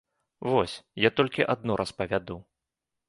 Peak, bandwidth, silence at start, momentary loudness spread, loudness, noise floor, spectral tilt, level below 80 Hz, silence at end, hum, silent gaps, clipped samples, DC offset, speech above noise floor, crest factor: -6 dBFS; 11.5 kHz; 0.4 s; 12 LU; -27 LUFS; -86 dBFS; -5.5 dB/octave; -56 dBFS; 0.7 s; none; none; under 0.1%; under 0.1%; 59 dB; 22 dB